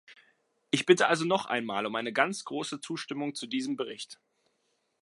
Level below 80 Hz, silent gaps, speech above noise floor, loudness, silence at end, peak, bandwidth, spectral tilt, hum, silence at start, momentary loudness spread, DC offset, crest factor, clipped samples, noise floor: -82 dBFS; none; 46 dB; -29 LUFS; 0.9 s; -6 dBFS; 11.5 kHz; -4 dB/octave; none; 0.1 s; 13 LU; under 0.1%; 24 dB; under 0.1%; -76 dBFS